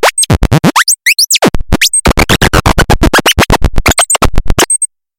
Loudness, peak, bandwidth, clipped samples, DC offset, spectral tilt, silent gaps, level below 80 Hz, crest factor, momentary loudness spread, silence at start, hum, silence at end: -8 LUFS; 0 dBFS; 17.5 kHz; 0.2%; under 0.1%; -3 dB/octave; none; -16 dBFS; 8 dB; 3 LU; 0 s; none; 0.35 s